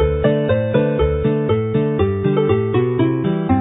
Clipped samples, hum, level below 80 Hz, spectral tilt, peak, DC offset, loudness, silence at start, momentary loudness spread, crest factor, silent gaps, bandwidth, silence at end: under 0.1%; none; -30 dBFS; -13 dB/octave; -2 dBFS; under 0.1%; -17 LUFS; 0 s; 2 LU; 14 dB; none; 4 kHz; 0 s